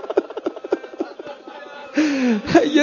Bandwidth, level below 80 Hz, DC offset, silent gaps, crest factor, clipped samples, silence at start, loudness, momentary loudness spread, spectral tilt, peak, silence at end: 7.4 kHz; -54 dBFS; under 0.1%; none; 20 dB; under 0.1%; 0 s; -21 LUFS; 20 LU; -5 dB/octave; 0 dBFS; 0 s